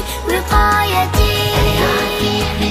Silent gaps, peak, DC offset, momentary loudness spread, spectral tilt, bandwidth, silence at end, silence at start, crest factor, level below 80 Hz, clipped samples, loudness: none; -2 dBFS; under 0.1%; 4 LU; -4.5 dB/octave; 15.5 kHz; 0 s; 0 s; 14 dB; -22 dBFS; under 0.1%; -15 LUFS